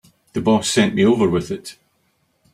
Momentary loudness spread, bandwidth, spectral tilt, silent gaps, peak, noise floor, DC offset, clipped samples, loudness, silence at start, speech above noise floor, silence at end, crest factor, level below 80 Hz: 14 LU; 15 kHz; -5 dB/octave; none; -2 dBFS; -65 dBFS; under 0.1%; under 0.1%; -18 LUFS; 0.35 s; 48 dB; 0.8 s; 18 dB; -52 dBFS